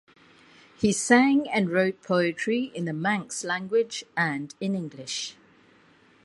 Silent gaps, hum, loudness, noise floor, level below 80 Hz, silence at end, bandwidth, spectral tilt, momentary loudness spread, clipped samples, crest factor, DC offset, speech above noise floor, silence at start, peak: none; none; -25 LUFS; -58 dBFS; -66 dBFS; 0.9 s; 11.5 kHz; -4.5 dB/octave; 12 LU; under 0.1%; 24 dB; under 0.1%; 33 dB; 0.8 s; -4 dBFS